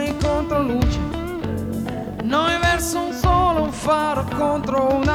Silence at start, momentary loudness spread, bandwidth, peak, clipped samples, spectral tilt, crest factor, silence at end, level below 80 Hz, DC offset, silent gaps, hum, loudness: 0 s; 9 LU; 17.5 kHz; -4 dBFS; under 0.1%; -5.5 dB/octave; 16 dB; 0 s; -30 dBFS; under 0.1%; none; none; -21 LUFS